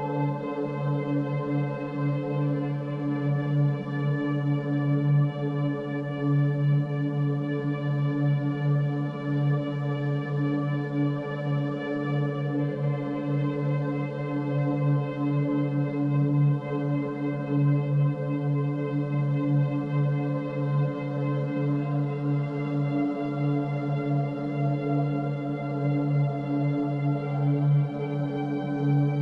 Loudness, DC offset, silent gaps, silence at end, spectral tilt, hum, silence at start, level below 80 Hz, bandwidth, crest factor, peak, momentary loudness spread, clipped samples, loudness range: -27 LUFS; under 0.1%; none; 0 s; -10.5 dB/octave; none; 0 s; -66 dBFS; 4.5 kHz; 12 dB; -14 dBFS; 5 LU; under 0.1%; 2 LU